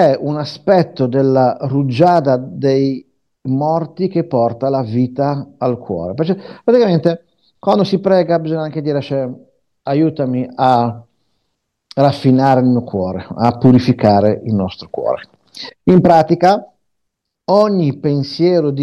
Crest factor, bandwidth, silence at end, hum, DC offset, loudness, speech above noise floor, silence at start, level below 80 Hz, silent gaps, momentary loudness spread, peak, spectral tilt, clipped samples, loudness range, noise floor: 14 dB; 8.8 kHz; 0 s; none; under 0.1%; -15 LUFS; 60 dB; 0 s; -54 dBFS; none; 10 LU; 0 dBFS; -8.5 dB/octave; under 0.1%; 4 LU; -74 dBFS